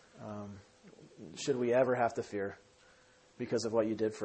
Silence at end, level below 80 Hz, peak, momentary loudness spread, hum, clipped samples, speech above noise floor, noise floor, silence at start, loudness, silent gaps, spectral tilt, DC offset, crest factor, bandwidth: 0 s; -74 dBFS; -16 dBFS; 20 LU; none; under 0.1%; 31 dB; -64 dBFS; 0.15 s; -34 LUFS; none; -5.5 dB/octave; under 0.1%; 20 dB; 8.8 kHz